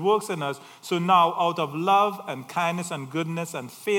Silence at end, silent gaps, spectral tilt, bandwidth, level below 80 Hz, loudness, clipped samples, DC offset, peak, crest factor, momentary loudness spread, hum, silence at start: 0 s; none; -5 dB/octave; 18 kHz; -80 dBFS; -25 LUFS; under 0.1%; under 0.1%; -6 dBFS; 18 dB; 13 LU; none; 0 s